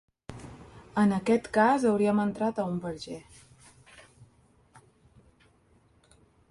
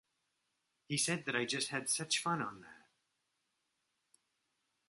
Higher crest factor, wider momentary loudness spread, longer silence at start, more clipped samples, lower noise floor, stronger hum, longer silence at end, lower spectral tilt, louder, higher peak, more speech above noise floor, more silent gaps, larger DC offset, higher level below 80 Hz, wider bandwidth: about the same, 20 dB vs 24 dB; first, 23 LU vs 7 LU; second, 0.3 s vs 0.9 s; neither; second, -64 dBFS vs -84 dBFS; neither; first, 2.25 s vs 2.1 s; first, -6.5 dB/octave vs -2.5 dB/octave; first, -27 LUFS vs -36 LUFS; first, -10 dBFS vs -18 dBFS; second, 38 dB vs 47 dB; neither; neither; first, -62 dBFS vs -82 dBFS; about the same, 11.5 kHz vs 12 kHz